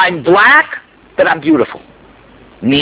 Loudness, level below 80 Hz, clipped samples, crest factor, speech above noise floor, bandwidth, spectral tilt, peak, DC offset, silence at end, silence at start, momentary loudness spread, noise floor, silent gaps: -10 LUFS; -48 dBFS; 0.2%; 12 dB; 31 dB; 4 kHz; -8.5 dB/octave; 0 dBFS; under 0.1%; 0 s; 0 s; 15 LU; -41 dBFS; none